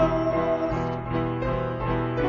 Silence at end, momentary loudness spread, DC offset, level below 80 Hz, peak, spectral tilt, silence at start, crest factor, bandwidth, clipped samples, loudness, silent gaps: 0 s; 4 LU; under 0.1%; -38 dBFS; -10 dBFS; -8.5 dB/octave; 0 s; 16 dB; 7 kHz; under 0.1%; -26 LUFS; none